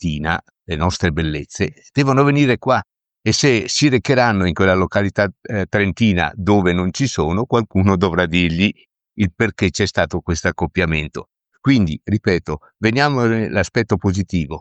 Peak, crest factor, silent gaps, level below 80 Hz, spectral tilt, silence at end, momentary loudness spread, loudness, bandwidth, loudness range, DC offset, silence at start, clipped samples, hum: -2 dBFS; 16 dB; none; -38 dBFS; -5.5 dB/octave; 0 s; 8 LU; -18 LUFS; 8.8 kHz; 3 LU; under 0.1%; 0 s; under 0.1%; none